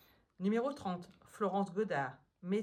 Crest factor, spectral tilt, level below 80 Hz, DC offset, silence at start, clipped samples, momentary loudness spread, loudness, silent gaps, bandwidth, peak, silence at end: 16 dB; -7 dB/octave; -78 dBFS; under 0.1%; 0.4 s; under 0.1%; 10 LU; -38 LUFS; none; 14 kHz; -22 dBFS; 0 s